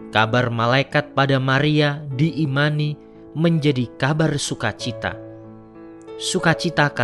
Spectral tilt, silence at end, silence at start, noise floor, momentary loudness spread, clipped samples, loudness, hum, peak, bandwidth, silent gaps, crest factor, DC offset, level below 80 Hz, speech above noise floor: -5.5 dB/octave; 0 s; 0 s; -41 dBFS; 15 LU; under 0.1%; -20 LUFS; none; 0 dBFS; 11.5 kHz; none; 20 dB; under 0.1%; -52 dBFS; 21 dB